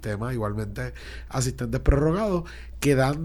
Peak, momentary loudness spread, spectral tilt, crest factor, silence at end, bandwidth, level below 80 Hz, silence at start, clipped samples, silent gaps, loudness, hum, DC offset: -6 dBFS; 13 LU; -6 dB/octave; 18 dB; 0 s; 19 kHz; -32 dBFS; 0 s; under 0.1%; none; -26 LUFS; none; under 0.1%